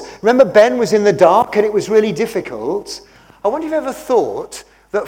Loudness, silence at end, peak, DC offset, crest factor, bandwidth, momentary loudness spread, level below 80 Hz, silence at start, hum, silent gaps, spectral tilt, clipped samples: -15 LUFS; 0 s; 0 dBFS; under 0.1%; 14 dB; 16.5 kHz; 15 LU; -52 dBFS; 0 s; none; none; -5 dB/octave; 0.3%